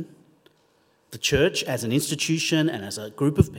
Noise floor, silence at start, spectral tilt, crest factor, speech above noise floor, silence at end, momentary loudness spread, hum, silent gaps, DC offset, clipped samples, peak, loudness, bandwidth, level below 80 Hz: -63 dBFS; 0 s; -4.5 dB/octave; 22 dB; 40 dB; 0 s; 11 LU; none; none; under 0.1%; under 0.1%; -4 dBFS; -24 LUFS; 16.5 kHz; -46 dBFS